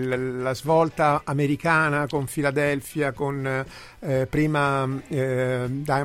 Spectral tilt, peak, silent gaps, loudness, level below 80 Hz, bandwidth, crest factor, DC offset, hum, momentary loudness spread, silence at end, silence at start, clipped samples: -6.5 dB/octave; -6 dBFS; none; -24 LUFS; -50 dBFS; 16 kHz; 18 dB; under 0.1%; none; 7 LU; 0 s; 0 s; under 0.1%